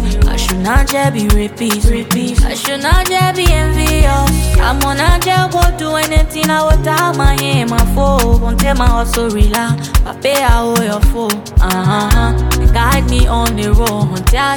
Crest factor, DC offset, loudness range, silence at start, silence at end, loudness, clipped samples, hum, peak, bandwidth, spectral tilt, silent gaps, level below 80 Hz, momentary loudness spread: 12 dB; under 0.1%; 1 LU; 0 s; 0 s; -13 LUFS; under 0.1%; none; 0 dBFS; 19 kHz; -5 dB/octave; none; -14 dBFS; 3 LU